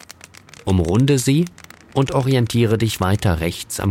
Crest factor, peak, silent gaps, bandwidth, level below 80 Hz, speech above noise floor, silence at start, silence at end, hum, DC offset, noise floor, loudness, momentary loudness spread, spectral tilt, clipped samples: 14 dB; -4 dBFS; none; 16.5 kHz; -38 dBFS; 26 dB; 0.65 s; 0 s; none; under 0.1%; -43 dBFS; -19 LUFS; 8 LU; -6 dB/octave; under 0.1%